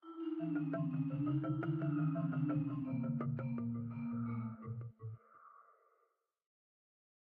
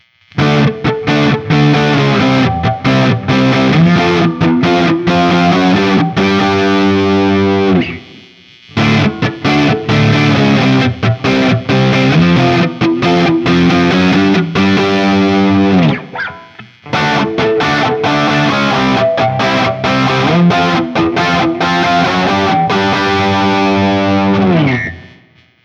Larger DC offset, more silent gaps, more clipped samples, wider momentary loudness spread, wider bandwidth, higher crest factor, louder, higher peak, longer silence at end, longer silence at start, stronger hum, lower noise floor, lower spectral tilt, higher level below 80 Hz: neither; neither; neither; first, 10 LU vs 4 LU; second, 3.5 kHz vs 7.8 kHz; about the same, 14 dB vs 10 dB; second, -40 LUFS vs -11 LUFS; second, -26 dBFS vs 0 dBFS; first, 1.65 s vs 0.55 s; second, 0.05 s vs 0.35 s; neither; first, -81 dBFS vs -46 dBFS; first, -10 dB/octave vs -6.5 dB/octave; second, -76 dBFS vs -40 dBFS